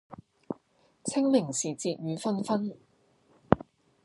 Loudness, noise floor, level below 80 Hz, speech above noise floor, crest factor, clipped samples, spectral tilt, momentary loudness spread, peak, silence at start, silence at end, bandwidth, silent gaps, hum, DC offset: -30 LUFS; -66 dBFS; -60 dBFS; 37 dB; 30 dB; under 0.1%; -5 dB/octave; 17 LU; -2 dBFS; 0.1 s; 0.4 s; 11.5 kHz; none; none; under 0.1%